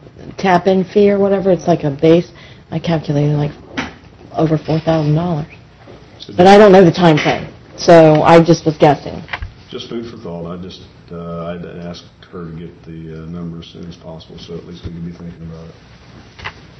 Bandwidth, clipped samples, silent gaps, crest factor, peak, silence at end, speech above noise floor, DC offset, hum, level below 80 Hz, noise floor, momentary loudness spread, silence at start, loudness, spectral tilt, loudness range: 8.6 kHz; 0.3%; none; 14 dB; 0 dBFS; 0.3 s; 26 dB; under 0.1%; none; -42 dBFS; -39 dBFS; 25 LU; 0.2 s; -12 LUFS; -7 dB/octave; 21 LU